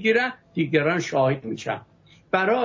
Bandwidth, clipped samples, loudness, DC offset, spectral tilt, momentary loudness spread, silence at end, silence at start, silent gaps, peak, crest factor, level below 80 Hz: 7.6 kHz; under 0.1%; -24 LUFS; under 0.1%; -5.5 dB/octave; 9 LU; 0 s; 0 s; none; -8 dBFS; 16 dB; -64 dBFS